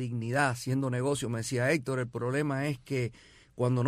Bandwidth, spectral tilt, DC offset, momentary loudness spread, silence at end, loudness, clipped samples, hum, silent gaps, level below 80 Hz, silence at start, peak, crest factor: 14.5 kHz; -6 dB/octave; under 0.1%; 5 LU; 0 s; -31 LUFS; under 0.1%; none; none; -62 dBFS; 0 s; -14 dBFS; 16 dB